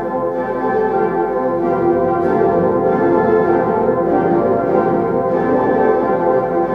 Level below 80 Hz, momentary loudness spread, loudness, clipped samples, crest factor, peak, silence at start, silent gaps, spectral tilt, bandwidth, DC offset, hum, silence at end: -46 dBFS; 3 LU; -15 LUFS; under 0.1%; 12 dB; -2 dBFS; 0 s; none; -10 dB/octave; 5.6 kHz; under 0.1%; none; 0 s